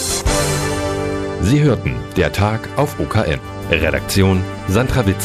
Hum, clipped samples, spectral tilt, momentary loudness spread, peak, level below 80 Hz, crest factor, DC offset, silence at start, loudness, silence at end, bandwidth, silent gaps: none; under 0.1%; -5 dB/octave; 6 LU; 0 dBFS; -30 dBFS; 16 dB; under 0.1%; 0 s; -17 LUFS; 0 s; 15.5 kHz; none